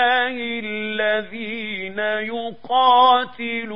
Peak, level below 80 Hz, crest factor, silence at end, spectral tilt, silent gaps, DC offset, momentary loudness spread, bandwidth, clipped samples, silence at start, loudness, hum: -4 dBFS; -64 dBFS; 16 dB; 0 s; -6 dB/octave; none; 0.8%; 13 LU; 5.4 kHz; under 0.1%; 0 s; -20 LUFS; none